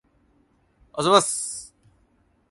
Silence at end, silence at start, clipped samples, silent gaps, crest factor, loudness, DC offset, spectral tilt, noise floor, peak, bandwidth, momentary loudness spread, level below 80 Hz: 0.85 s; 0.95 s; under 0.1%; none; 26 dB; -21 LUFS; under 0.1%; -2.5 dB/octave; -64 dBFS; -2 dBFS; 11.5 kHz; 18 LU; -64 dBFS